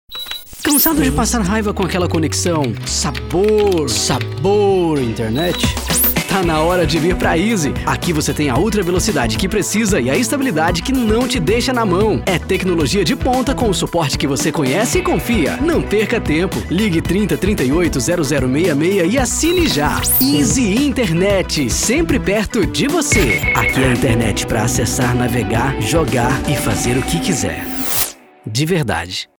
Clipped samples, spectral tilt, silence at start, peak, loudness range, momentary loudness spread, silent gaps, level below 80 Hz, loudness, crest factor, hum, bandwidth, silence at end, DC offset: under 0.1%; -4.5 dB/octave; 0.1 s; 0 dBFS; 2 LU; 4 LU; none; -28 dBFS; -15 LUFS; 16 dB; none; 17.5 kHz; 0.15 s; under 0.1%